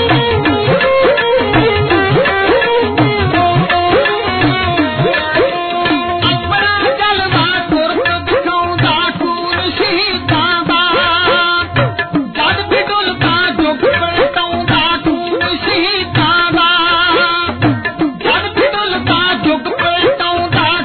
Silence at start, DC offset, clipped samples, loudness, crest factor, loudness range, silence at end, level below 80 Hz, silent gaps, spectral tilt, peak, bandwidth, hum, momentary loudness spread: 0 s; under 0.1%; under 0.1%; -12 LUFS; 12 dB; 2 LU; 0 s; -36 dBFS; none; -2.5 dB/octave; 0 dBFS; 4.6 kHz; none; 4 LU